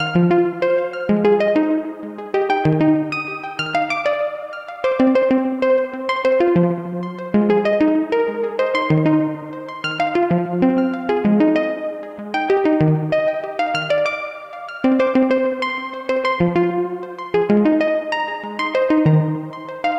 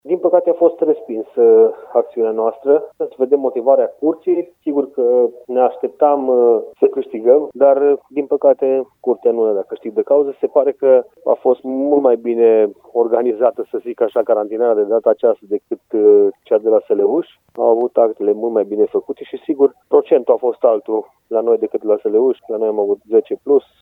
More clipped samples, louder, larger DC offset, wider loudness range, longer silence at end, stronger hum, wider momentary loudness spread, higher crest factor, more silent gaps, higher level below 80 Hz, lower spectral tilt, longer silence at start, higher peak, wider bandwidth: neither; about the same, -18 LUFS vs -16 LUFS; neither; about the same, 2 LU vs 2 LU; second, 0 s vs 0.2 s; neither; about the same, 10 LU vs 8 LU; about the same, 14 dB vs 14 dB; neither; first, -54 dBFS vs -74 dBFS; about the same, -8 dB/octave vs -9 dB/octave; about the same, 0 s vs 0.05 s; second, -4 dBFS vs 0 dBFS; first, 8.4 kHz vs 3.8 kHz